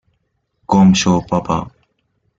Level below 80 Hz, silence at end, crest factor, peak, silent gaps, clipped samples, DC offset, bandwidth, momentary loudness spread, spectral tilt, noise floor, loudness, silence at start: -44 dBFS; 0.7 s; 14 dB; -2 dBFS; none; under 0.1%; under 0.1%; 7.8 kHz; 11 LU; -5.5 dB/octave; -68 dBFS; -14 LUFS; 0.7 s